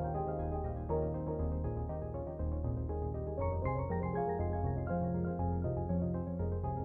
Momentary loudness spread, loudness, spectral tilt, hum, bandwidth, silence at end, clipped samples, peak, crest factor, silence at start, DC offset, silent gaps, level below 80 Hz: 4 LU; -37 LUFS; -12 dB/octave; none; 2.6 kHz; 0 s; under 0.1%; -22 dBFS; 14 dB; 0 s; under 0.1%; none; -44 dBFS